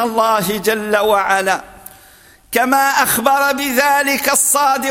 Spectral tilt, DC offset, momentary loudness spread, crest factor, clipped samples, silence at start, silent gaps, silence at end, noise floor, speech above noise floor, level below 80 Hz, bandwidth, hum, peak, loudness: -2 dB/octave; under 0.1%; 5 LU; 16 dB; under 0.1%; 0 s; none; 0 s; -45 dBFS; 31 dB; -52 dBFS; 17 kHz; none; 0 dBFS; -14 LUFS